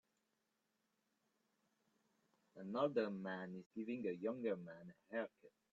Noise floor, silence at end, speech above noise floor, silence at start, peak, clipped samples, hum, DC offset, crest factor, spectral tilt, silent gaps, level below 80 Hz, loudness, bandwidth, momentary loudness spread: -87 dBFS; 0.25 s; 42 dB; 2.55 s; -26 dBFS; under 0.1%; none; under 0.1%; 22 dB; -5.5 dB/octave; 3.66-3.71 s; under -90 dBFS; -45 LUFS; 7.6 kHz; 13 LU